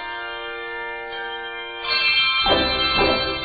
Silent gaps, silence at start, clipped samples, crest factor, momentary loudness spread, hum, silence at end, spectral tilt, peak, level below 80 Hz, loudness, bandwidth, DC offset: none; 0 s; under 0.1%; 18 dB; 13 LU; none; 0 s; -8 dB/octave; -4 dBFS; -42 dBFS; -20 LUFS; 5.2 kHz; under 0.1%